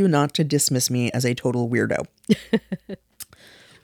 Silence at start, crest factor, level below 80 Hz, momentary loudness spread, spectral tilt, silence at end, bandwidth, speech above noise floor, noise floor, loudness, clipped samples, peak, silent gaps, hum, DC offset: 0 s; 18 dB; -58 dBFS; 20 LU; -4.5 dB/octave; 0.6 s; 19.5 kHz; 28 dB; -50 dBFS; -22 LUFS; under 0.1%; -4 dBFS; none; none; under 0.1%